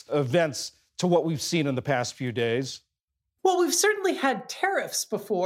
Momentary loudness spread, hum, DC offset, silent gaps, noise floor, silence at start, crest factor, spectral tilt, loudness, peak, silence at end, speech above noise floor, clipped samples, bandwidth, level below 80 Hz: 8 LU; none; under 0.1%; 3.03-3.08 s; -84 dBFS; 0.1 s; 18 dB; -4 dB/octave; -26 LUFS; -8 dBFS; 0 s; 58 dB; under 0.1%; 16.5 kHz; -72 dBFS